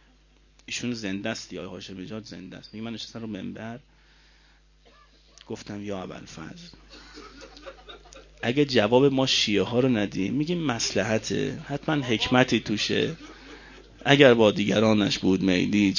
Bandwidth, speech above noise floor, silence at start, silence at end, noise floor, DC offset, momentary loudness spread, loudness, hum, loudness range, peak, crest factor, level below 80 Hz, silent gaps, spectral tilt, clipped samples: 7.4 kHz; 34 dB; 0.7 s; 0 s; -58 dBFS; under 0.1%; 24 LU; -24 LUFS; none; 18 LU; -2 dBFS; 24 dB; -54 dBFS; none; -5 dB/octave; under 0.1%